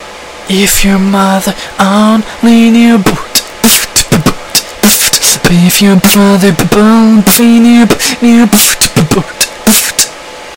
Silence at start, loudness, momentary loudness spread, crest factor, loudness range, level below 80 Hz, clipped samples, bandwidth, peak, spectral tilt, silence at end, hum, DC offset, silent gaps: 0 s; -6 LUFS; 7 LU; 6 dB; 2 LU; -28 dBFS; 5%; over 20 kHz; 0 dBFS; -3.5 dB/octave; 0 s; none; 1%; none